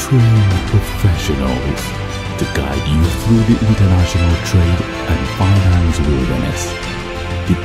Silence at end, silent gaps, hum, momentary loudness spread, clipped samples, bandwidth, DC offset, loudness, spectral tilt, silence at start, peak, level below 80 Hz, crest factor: 0 s; none; none; 9 LU; under 0.1%; 15 kHz; under 0.1%; -15 LUFS; -6 dB/octave; 0 s; 0 dBFS; -24 dBFS; 14 dB